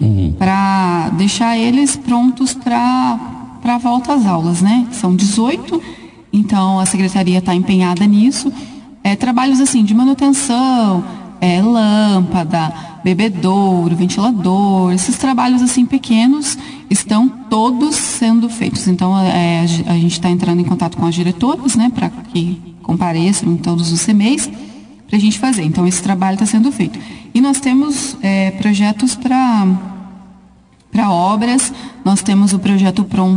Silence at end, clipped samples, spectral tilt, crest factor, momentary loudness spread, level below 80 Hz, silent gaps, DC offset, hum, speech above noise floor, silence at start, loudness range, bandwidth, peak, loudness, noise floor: 0 s; under 0.1%; -5 dB/octave; 12 dB; 8 LU; -46 dBFS; none; under 0.1%; none; 33 dB; 0 s; 3 LU; 10.5 kHz; -2 dBFS; -14 LUFS; -46 dBFS